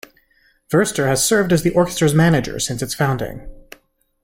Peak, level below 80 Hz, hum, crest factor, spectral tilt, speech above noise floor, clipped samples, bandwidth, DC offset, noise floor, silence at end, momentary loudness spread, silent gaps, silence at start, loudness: -4 dBFS; -42 dBFS; none; 16 dB; -5 dB/octave; 42 dB; under 0.1%; 16.5 kHz; under 0.1%; -59 dBFS; 0.65 s; 8 LU; none; 0.7 s; -17 LUFS